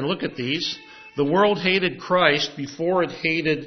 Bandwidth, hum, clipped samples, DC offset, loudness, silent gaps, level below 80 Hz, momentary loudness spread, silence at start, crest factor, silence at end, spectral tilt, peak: 6.4 kHz; none; under 0.1%; under 0.1%; -22 LUFS; none; -62 dBFS; 9 LU; 0 s; 20 dB; 0 s; -5 dB/octave; -2 dBFS